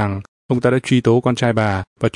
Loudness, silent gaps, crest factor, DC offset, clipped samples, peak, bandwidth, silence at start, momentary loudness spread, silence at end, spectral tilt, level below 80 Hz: -17 LUFS; 0.28-0.49 s, 1.87-1.96 s; 14 dB; under 0.1%; under 0.1%; -2 dBFS; 11 kHz; 0 s; 8 LU; 0.05 s; -7 dB/octave; -50 dBFS